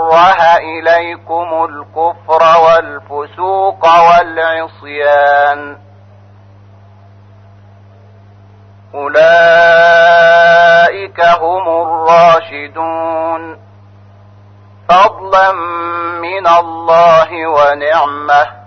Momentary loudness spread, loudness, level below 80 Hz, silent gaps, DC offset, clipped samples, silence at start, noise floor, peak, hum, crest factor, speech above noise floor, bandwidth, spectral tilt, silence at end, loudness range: 13 LU; -9 LUFS; -50 dBFS; none; under 0.1%; under 0.1%; 0 s; -39 dBFS; 0 dBFS; none; 10 dB; 29 dB; 6.6 kHz; -4 dB/octave; 0.15 s; 8 LU